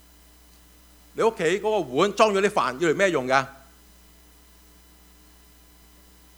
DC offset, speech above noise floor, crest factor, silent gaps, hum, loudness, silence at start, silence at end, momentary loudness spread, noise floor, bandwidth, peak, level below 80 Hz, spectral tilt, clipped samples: under 0.1%; 31 dB; 22 dB; none; none; -22 LUFS; 1.15 s; 2.85 s; 5 LU; -53 dBFS; over 20 kHz; -4 dBFS; -56 dBFS; -4.5 dB/octave; under 0.1%